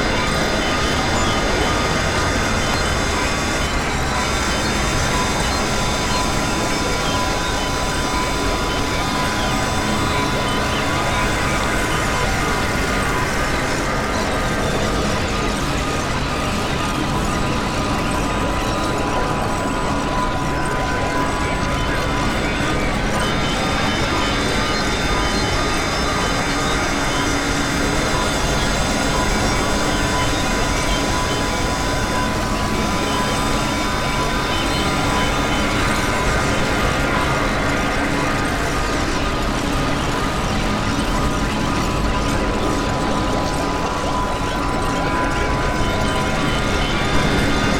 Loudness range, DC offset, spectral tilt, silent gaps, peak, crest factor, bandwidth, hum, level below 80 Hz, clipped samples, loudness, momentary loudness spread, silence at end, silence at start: 2 LU; under 0.1%; -4 dB/octave; none; -4 dBFS; 14 dB; 18 kHz; none; -28 dBFS; under 0.1%; -19 LUFS; 2 LU; 0 s; 0 s